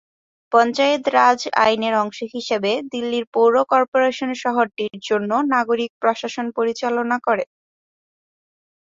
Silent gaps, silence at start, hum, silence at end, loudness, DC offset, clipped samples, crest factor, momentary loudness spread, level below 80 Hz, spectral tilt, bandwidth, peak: 3.27-3.32 s, 3.88-3.92 s, 5.90-6.01 s; 0.5 s; none; 1.55 s; -19 LUFS; under 0.1%; under 0.1%; 18 dB; 8 LU; -66 dBFS; -4 dB/octave; 7.8 kHz; -2 dBFS